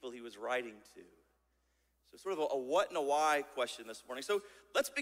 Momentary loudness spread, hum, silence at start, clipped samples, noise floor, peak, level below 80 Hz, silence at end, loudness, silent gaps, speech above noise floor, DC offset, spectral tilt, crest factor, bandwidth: 15 LU; none; 0.05 s; under 0.1%; -77 dBFS; -20 dBFS; -78 dBFS; 0 s; -36 LUFS; none; 41 dB; under 0.1%; -2 dB/octave; 18 dB; 16 kHz